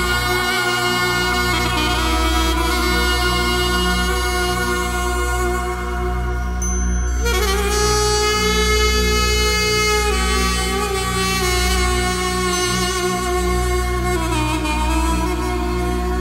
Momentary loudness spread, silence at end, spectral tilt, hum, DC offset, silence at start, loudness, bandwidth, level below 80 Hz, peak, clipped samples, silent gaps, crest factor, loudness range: 5 LU; 0 s; -3.5 dB/octave; 60 Hz at -25 dBFS; under 0.1%; 0 s; -18 LUFS; 16.5 kHz; -22 dBFS; -4 dBFS; under 0.1%; none; 14 dB; 4 LU